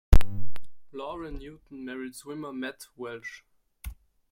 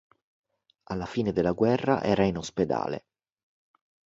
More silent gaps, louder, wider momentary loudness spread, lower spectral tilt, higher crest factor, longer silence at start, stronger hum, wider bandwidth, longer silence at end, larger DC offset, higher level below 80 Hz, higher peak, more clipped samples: neither; second, -36 LUFS vs -27 LUFS; about the same, 12 LU vs 11 LU; about the same, -6 dB/octave vs -6.5 dB/octave; about the same, 20 dB vs 22 dB; second, 0.1 s vs 0.9 s; neither; first, 16.5 kHz vs 8 kHz; second, 0.4 s vs 1.15 s; neither; first, -30 dBFS vs -54 dBFS; first, -2 dBFS vs -8 dBFS; neither